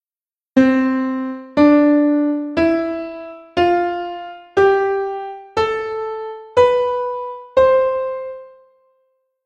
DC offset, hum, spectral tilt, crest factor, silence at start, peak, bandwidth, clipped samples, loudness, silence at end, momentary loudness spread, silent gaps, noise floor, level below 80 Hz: under 0.1%; none; -6.5 dB/octave; 16 dB; 0.55 s; 0 dBFS; 7.8 kHz; under 0.1%; -17 LUFS; 0.95 s; 15 LU; none; under -90 dBFS; -50 dBFS